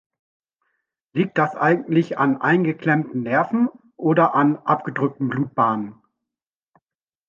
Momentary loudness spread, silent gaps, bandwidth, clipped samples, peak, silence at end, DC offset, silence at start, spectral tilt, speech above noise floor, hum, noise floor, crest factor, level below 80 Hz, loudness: 7 LU; none; 7.2 kHz; under 0.1%; -2 dBFS; 1.35 s; under 0.1%; 1.15 s; -9 dB/octave; 69 dB; none; -89 dBFS; 18 dB; -68 dBFS; -20 LUFS